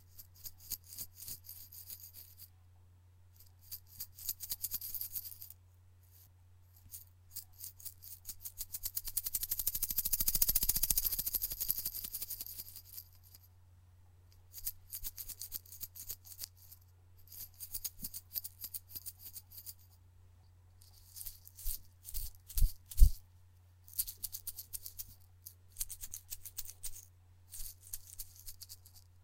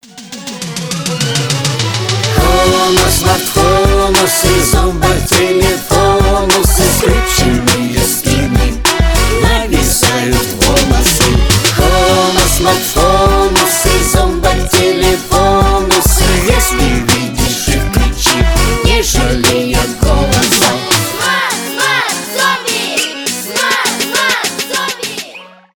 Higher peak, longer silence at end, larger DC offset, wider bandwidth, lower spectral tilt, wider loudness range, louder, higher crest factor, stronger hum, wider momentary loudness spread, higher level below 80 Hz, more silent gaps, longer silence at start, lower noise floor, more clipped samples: second, -6 dBFS vs 0 dBFS; second, 0.05 s vs 0.3 s; neither; second, 17 kHz vs over 20 kHz; second, -1.5 dB/octave vs -3.5 dB/octave; first, 15 LU vs 3 LU; second, -39 LUFS vs -11 LUFS; first, 34 dB vs 10 dB; neither; first, 20 LU vs 5 LU; second, -44 dBFS vs -18 dBFS; neither; about the same, 0.15 s vs 0.15 s; first, -62 dBFS vs -33 dBFS; neither